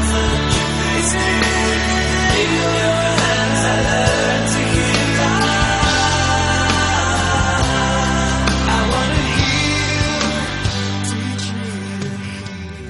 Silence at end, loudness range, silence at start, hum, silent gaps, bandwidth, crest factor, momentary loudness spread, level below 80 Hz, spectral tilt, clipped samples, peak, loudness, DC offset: 0 s; 3 LU; 0 s; none; none; 11.5 kHz; 16 dB; 7 LU; -26 dBFS; -4 dB/octave; under 0.1%; 0 dBFS; -16 LUFS; under 0.1%